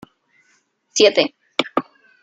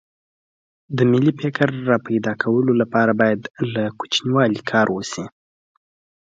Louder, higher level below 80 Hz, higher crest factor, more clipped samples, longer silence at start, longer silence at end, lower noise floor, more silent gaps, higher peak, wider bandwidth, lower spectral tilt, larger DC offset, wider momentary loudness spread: about the same, -18 LUFS vs -19 LUFS; second, -70 dBFS vs -60 dBFS; about the same, 20 dB vs 18 dB; neither; about the same, 0.95 s vs 0.9 s; second, 0.4 s vs 1 s; second, -63 dBFS vs under -90 dBFS; second, none vs 3.50-3.54 s; about the same, -2 dBFS vs -2 dBFS; first, 9.2 kHz vs 7.8 kHz; second, -2 dB/octave vs -6 dB/octave; neither; about the same, 11 LU vs 9 LU